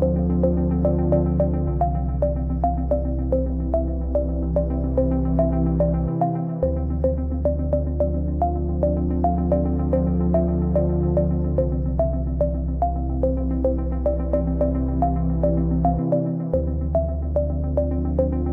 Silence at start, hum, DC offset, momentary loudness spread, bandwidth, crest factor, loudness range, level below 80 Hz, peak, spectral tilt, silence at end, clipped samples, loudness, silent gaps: 0 s; none; under 0.1%; 3 LU; 2.5 kHz; 14 dB; 2 LU; -26 dBFS; -6 dBFS; -13.5 dB/octave; 0 s; under 0.1%; -22 LUFS; none